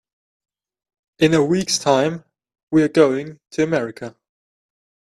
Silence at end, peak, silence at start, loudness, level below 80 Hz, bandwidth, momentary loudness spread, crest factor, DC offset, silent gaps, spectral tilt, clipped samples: 1 s; 0 dBFS; 1.2 s; -18 LUFS; -58 dBFS; 13 kHz; 14 LU; 20 dB; under 0.1%; 2.63-2.67 s; -5 dB/octave; under 0.1%